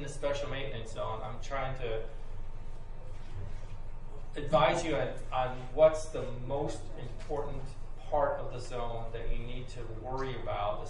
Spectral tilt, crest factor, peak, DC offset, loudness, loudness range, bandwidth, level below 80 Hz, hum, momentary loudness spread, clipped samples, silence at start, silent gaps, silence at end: -5.5 dB/octave; 22 dB; -12 dBFS; under 0.1%; -34 LUFS; 10 LU; 10.5 kHz; -42 dBFS; none; 21 LU; under 0.1%; 0 s; none; 0 s